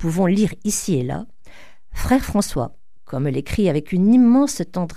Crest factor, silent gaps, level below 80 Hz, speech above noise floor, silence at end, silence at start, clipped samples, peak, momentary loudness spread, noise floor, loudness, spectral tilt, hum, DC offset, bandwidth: 16 dB; none; -36 dBFS; 29 dB; 0 s; 0 s; under 0.1%; -4 dBFS; 16 LU; -47 dBFS; -19 LUFS; -6 dB/octave; none; 2%; 15.5 kHz